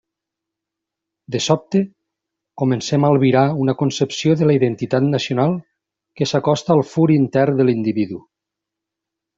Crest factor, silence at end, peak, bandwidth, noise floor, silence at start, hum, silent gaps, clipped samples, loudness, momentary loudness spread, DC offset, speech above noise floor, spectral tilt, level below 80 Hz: 16 dB; 1.2 s; -2 dBFS; 7.8 kHz; -83 dBFS; 1.3 s; none; none; under 0.1%; -18 LUFS; 8 LU; under 0.1%; 67 dB; -6.5 dB/octave; -58 dBFS